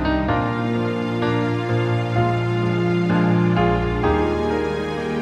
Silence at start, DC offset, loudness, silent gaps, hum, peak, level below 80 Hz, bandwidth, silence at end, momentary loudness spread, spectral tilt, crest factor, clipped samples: 0 s; under 0.1%; -20 LUFS; none; none; -6 dBFS; -34 dBFS; 8.8 kHz; 0 s; 5 LU; -8 dB/octave; 14 dB; under 0.1%